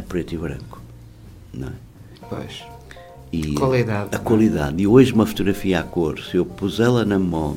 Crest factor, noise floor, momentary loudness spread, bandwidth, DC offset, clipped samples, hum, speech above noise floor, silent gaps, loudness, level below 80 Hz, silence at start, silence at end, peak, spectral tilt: 20 dB; -42 dBFS; 23 LU; 16.5 kHz; under 0.1%; under 0.1%; none; 22 dB; none; -19 LUFS; -40 dBFS; 0 s; 0 s; 0 dBFS; -7 dB/octave